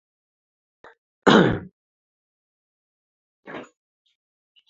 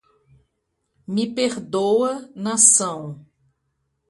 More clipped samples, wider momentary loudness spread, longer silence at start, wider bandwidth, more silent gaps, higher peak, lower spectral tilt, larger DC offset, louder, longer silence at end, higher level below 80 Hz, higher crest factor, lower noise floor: neither; first, 24 LU vs 16 LU; first, 1.25 s vs 1.1 s; second, 7.8 kHz vs 11.5 kHz; first, 1.72-3.43 s vs none; about the same, -2 dBFS vs 0 dBFS; first, -6 dB/octave vs -3 dB/octave; neither; about the same, -19 LUFS vs -18 LUFS; first, 1.05 s vs 0.9 s; first, -54 dBFS vs -68 dBFS; about the same, 26 dB vs 22 dB; first, under -90 dBFS vs -74 dBFS